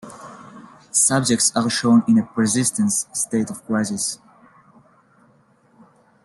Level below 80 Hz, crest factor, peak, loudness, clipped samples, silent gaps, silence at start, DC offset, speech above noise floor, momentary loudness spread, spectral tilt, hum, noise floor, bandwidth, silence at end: -62 dBFS; 20 dB; -2 dBFS; -19 LUFS; under 0.1%; none; 0.05 s; under 0.1%; 38 dB; 12 LU; -3.5 dB/octave; none; -57 dBFS; 12.5 kHz; 2.1 s